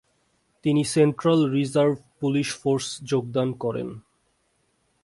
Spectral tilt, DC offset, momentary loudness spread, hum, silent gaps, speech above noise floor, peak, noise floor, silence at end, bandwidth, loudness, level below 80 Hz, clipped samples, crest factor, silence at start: -6 dB/octave; under 0.1%; 9 LU; none; none; 46 dB; -8 dBFS; -69 dBFS; 1.05 s; 11.5 kHz; -24 LUFS; -62 dBFS; under 0.1%; 18 dB; 0.65 s